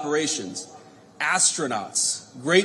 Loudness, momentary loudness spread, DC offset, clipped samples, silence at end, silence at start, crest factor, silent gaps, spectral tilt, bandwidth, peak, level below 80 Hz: -23 LUFS; 15 LU; under 0.1%; under 0.1%; 0 s; 0 s; 20 dB; none; -2 dB/octave; 13 kHz; -6 dBFS; -76 dBFS